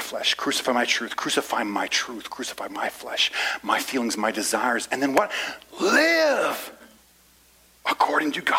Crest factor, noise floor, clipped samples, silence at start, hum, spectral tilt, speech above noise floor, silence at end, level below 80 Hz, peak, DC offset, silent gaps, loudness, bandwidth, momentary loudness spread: 20 dB; -57 dBFS; under 0.1%; 0 s; none; -1.5 dB/octave; 32 dB; 0 s; -66 dBFS; -4 dBFS; under 0.1%; none; -23 LUFS; 16 kHz; 11 LU